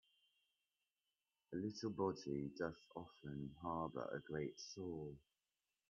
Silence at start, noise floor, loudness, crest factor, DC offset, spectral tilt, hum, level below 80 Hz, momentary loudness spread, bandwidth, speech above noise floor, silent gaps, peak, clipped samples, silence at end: 1.5 s; under -90 dBFS; -48 LUFS; 22 dB; under 0.1%; -6 dB/octave; none; -74 dBFS; 11 LU; 7.2 kHz; over 43 dB; none; -28 dBFS; under 0.1%; 0.7 s